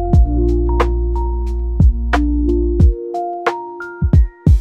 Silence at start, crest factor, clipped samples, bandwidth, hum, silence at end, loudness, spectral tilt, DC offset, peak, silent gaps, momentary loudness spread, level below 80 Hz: 0 s; 12 dB; under 0.1%; 6.4 kHz; none; 0 s; -17 LUFS; -9 dB/octave; under 0.1%; -2 dBFS; none; 8 LU; -16 dBFS